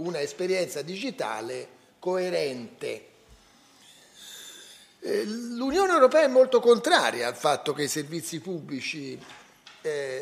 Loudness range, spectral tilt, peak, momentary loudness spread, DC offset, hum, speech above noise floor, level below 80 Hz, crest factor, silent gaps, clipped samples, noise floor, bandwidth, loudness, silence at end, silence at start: 12 LU; -3.5 dB/octave; -6 dBFS; 21 LU; under 0.1%; none; 31 dB; -66 dBFS; 22 dB; none; under 0.1%; -57 dBFS; 15.5 kHz; -26 LUFS; 0 s; 0 s